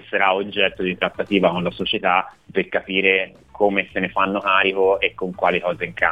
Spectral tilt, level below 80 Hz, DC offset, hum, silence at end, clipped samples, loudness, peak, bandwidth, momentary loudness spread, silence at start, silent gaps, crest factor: -6.5 dB/octave; -54 dBFS; 0.1%; none; 0 s; under 0.1%; -20 LUFS; -2 dBFS; 7.8 kHz; 6 LU; 0.05 s; none; 20 dB